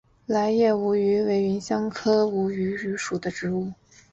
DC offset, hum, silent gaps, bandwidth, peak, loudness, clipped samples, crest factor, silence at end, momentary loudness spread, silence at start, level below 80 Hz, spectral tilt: under 0.1%; none; none; 8 kHz; -10 dBFS; -24 LUFS; under 0.1%; 14 dB; 0.4 s; 8 LU; 0.3 s; -60 dBFS; -6 dB/octave